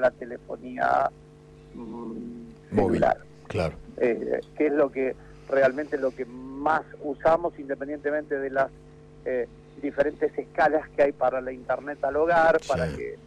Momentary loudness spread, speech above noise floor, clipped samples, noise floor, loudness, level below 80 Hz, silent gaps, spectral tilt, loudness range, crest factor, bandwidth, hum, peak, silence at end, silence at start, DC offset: 14 LU; 23 dB; under 0.1%; -49 dBFS; -26 LUFS; -52 dBFS; none; -7 dB/octave; 4 LU; 16 dB; 10 kHz; none; -12 dBFS; 0.05 s; 0 s; under 0.1%